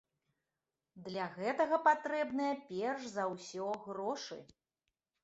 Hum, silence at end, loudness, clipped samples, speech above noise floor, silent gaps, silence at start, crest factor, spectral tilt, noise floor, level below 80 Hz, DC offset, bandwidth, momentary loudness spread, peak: none; 0.8 s; -36 LUFS; under 0.1%; over 54 dB; none; 0.95 s; 22 dB; -3 dB/octave; under -90 dBFS; -82 dBFS; under 0.1%; 8 kHz; 13 LU; -16 dBFS